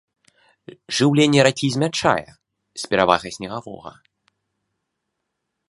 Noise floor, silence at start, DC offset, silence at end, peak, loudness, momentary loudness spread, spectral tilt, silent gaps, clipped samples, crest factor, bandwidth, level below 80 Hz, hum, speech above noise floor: -78 dBFS; 0.9 s; under 0.1%; 1.8 s; 0 dBFS; -19 LUFS; 18 LU; -4.5 dB/octave; none; under 0.1%; 22 dB; 11.5 kHz; -56 dBFS; none; 59 dB